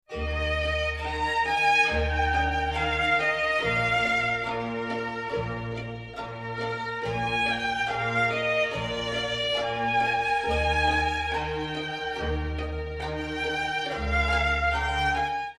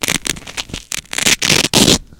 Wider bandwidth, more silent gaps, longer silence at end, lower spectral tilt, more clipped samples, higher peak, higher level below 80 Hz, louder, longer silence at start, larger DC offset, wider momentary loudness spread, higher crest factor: second, 12 kHz vs over 20 kHz; neither; about the same, 0.05 s vs 0.15 s; first, -4.5 dB/octave vs -2 dB/octave; second, under 0.1% vs 0.2%; second, -10 dBFS vs 0 dBFS; about the same, -38 dBFS vs -36 dBFS; second, -26 LUFS vs -13 LUFS; about the same, 0.1 s vs 0 s; neither; second, 9 LU vs 14 LU; about the same, 16 dB vs 16 dB